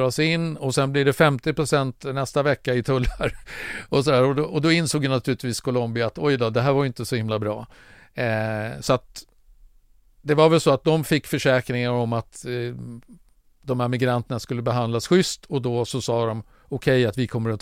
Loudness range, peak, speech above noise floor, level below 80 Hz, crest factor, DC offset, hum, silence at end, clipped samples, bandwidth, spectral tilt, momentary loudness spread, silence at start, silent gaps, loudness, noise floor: 4 LU; -2 dBFS; 33 dB; -44 dBFS; 20 dB; under 0.1%; none; 0.05 s; under 0.1%; 16 kHz; -5.5 dB/octave; 10 LU; 0 s; none; -23 LUFS; -55 dBFS